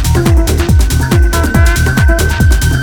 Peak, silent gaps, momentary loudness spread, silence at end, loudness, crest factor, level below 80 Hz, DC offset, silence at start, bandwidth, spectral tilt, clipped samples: 0 dBFS; none; 1 LU; 0 s; -10 LUFS; 8 dB; -12 dBFS; under 0.1%; 0 s; 19.5 kHz; -5.5 dB/octave; under 0.1%